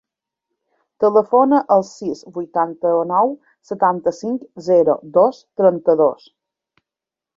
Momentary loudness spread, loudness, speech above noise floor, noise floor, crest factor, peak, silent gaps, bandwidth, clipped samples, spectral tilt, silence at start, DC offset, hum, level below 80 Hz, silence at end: 12 LU; -17 LUFS; 71 dB; -87 dBFS; 16 dB; -2 dBFS; none; 7.6 kHz; under 0.1%; -7.5 dB/octave; 1 s; under 0.1%; none; -64 dBFS; 1.25 s